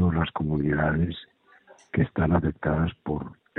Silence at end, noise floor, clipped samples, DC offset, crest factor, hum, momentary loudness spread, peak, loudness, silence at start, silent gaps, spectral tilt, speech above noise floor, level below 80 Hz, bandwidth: 0.25 s; -55 dBFS; under 0.1%; under 0.1%; 18 dB; none; 9 LU; -8 dBFS; -26 LUFS; 0 s; none; -9.5 dB/octave; 30 dB; -40 dBFS; 4.1 kHz